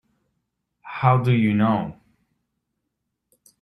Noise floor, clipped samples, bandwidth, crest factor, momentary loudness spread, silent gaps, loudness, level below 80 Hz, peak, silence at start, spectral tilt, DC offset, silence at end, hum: -79 dBFS; under 0.1%; 5.4 kHz; 22 dB; 15 LU; none; -20 LUFS; -60 dBFS; -2 dBFS; 0.85 s; -9 dB/octave; under 0.1%; 1.7 s; none